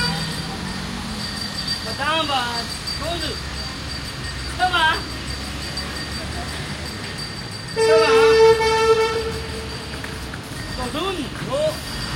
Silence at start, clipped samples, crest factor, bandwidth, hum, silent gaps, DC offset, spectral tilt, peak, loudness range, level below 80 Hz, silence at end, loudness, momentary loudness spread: 0 s; under 0.1%; 18 dB; 16.5 kHz; none; none; under 0.1%; -3.5 dB/octave; -4 dBFS; 6 LU; -38 dBFS; 0 s; -21 LUFS; 14 LU